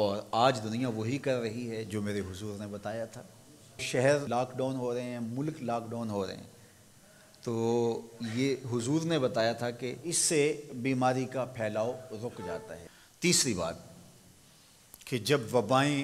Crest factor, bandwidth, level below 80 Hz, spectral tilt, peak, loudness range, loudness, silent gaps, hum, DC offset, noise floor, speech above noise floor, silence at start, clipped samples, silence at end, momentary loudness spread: 20 dB; 16 kHz; -68 dBFS; -4.5 dB/octave; -12 dBFS; 5 LU; -31 LUFS; none; none; under 0.1%; -59 dBFS; 28 dB; 0 s; under 0.1%; 0 s; 13 LU